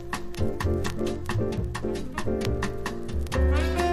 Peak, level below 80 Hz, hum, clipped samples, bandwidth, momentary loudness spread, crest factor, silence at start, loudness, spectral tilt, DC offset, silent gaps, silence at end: -10 dBFS; -32 dBFS; none; under 0.1%; 14.5 kHz; 7 LU; 16 dB; 0 s; -29 LUFS; -6 dB/octave; under 0.1%; none; 0 s